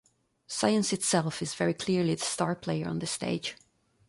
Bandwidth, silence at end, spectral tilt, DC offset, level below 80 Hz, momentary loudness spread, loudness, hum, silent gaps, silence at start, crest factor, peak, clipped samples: 11.5 kHz; 0.55 s; -4 dB/octave; under 0.1%; -64 dBFS; 7 LU; -29 LUFS; none; none; 0.5 s; 20 dB; -10 dBFS; under 0.1%